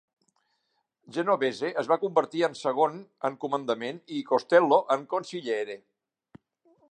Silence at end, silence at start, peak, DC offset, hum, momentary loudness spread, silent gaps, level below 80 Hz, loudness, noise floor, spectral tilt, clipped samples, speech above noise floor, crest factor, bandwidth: 1.15 s; 1.1 s; -6 dBFS; under 0.1%; none; 11 LU; none; -82 dBFS; -27 LUFS; -77 dBFS; -5 dB/octave; under 0.1%; 50 dB; 22 dB; 9.6 kHz